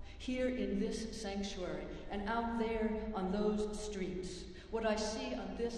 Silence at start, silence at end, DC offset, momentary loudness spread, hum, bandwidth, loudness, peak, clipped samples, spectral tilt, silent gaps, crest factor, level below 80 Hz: 0 s; 0 s; under 0.1%; 7 LU; none; 11.5 kHz; -39 LUFS; -22 dBFS; under 0.1%; -5 dB/octave; none; 16 dB; -52 dBFS